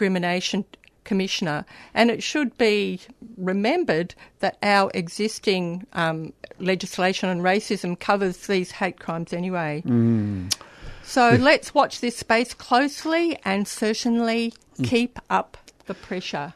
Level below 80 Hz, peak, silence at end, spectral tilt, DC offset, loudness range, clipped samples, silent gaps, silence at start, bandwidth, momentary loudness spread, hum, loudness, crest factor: -54 dBFS; -4 dBFS; 0.05 s; -5 dB/octave; under 0.1%; 4 LU; under 0.1%; none; 0 s; 13.5 kHz; 10 LU; none; -23 LUFS; 20 dB